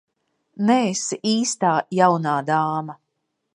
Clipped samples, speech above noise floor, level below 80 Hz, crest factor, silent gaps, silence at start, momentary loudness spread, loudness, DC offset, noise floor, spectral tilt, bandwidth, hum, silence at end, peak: under 0.1%; 56 dB; -72 dBFS; 20 dB; none; 0.55 s; 7 LU; -21 LUFS; under 0.1%; -76 dBFS; -4.5 dB/octave; 11.5 kHz; none; 0.6 s; -2 dBFS